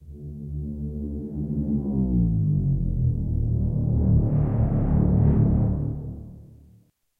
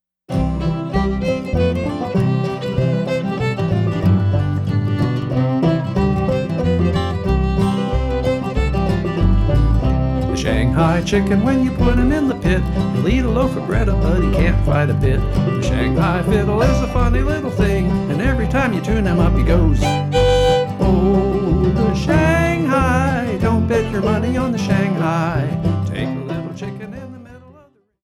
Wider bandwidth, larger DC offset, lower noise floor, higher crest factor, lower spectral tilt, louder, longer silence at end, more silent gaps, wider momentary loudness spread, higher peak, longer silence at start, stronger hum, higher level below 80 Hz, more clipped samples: second, 2.3 kHz vs 13 kHz; neither; first, -58 dBFS vs -50 dBFS; about the same, 14 dB vs 12 dB; first, -13.5 dB/octave vs -7.5 dB/octave; second, -24 LUFS vs -17 LUFS; about the same, 0.65 s vs 0.65 s; neither; first, 14 LU vs 5 LU; second, -10 dBFS vs -4 dBFS; second, 0 s vs 0.3 s; neither; second, -30 dBFS vs -24 dBFS; neither